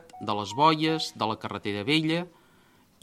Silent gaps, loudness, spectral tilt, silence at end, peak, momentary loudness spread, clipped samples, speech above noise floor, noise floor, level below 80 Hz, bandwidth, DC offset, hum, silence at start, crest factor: none; -27 LUFS; -5 dB/octave; 0.75 s; -6 dBFS; 10 LU; under 0.1%; 34 dB; -60 dBFS; -70 dBFS; 14 kHz; under 0.1%; none; 0.15 s; 22 dB